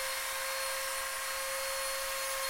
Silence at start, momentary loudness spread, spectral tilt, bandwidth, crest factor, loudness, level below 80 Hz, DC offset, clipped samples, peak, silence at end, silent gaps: 0 s; 1 LU; 2 dB/octave; 16.5 kHz; 14 dB; -34 LUFS; -60 dBFS; under 0.1%; under 0.1%; -22 dBFS; 0 s; none